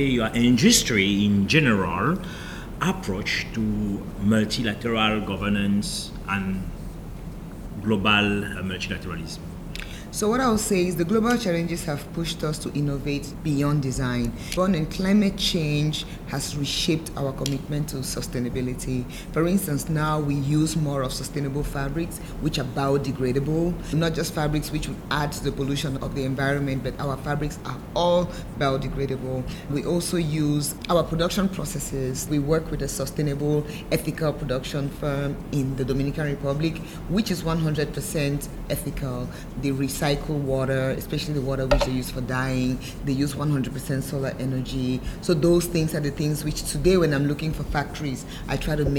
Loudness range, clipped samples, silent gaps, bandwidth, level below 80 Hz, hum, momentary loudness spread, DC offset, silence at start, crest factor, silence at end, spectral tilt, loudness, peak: 3 LU; under 0.1%; none; over 20 kHz; -38 dBFS; none; 9 LU; under 0.1%; 0 s; 22 dB; 0 s; -5 dB/octave; -25 LUFS; -2 dBFS